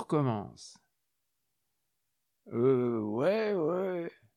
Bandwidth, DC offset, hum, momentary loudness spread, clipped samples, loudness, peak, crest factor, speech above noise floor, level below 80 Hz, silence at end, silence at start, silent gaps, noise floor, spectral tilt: 10.5 kHz; under 0.1%; none; 16 LU; under 0.1%; -31 LUFS; -16 dBFS; 16 dB; 53 dB; -78 dBFS; 0.25 s; 0 s; none; -83 dBFS; -8 dB/octave